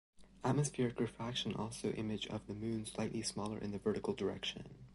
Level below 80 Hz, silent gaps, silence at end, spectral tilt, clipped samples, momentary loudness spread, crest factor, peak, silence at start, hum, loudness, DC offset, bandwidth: -64 dBFS; none; 0 s; -5 dB/octave; under 0.1%; 6 LU; 18 dB; -22 dBFS; 0.2 s; none; -40 LUFS; under 0.1%; 11.5 kHz